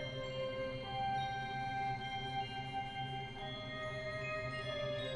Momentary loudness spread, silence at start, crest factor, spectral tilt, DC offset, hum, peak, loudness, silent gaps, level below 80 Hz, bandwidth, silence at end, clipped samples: 4 LU; 0 s; 12 dB; -5.5 dB/octave; under 0.1%; none; -28 dBFS; -41 LUFS; none; -60 dBFS; 11.5 kHz; 0 s; under 0.1%